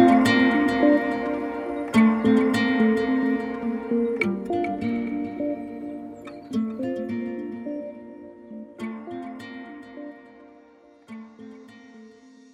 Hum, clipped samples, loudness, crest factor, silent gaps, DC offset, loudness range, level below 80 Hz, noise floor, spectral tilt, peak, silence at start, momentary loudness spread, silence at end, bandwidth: none; under 0.1%; -24 LUFS; 20 dB; none; under 0.1%; 18 LU; -58 dBFS; -53 dBFS; -6 dB/octave; -4 dBFS; 0 s; 22 LU; 0.45 s; 13 kHz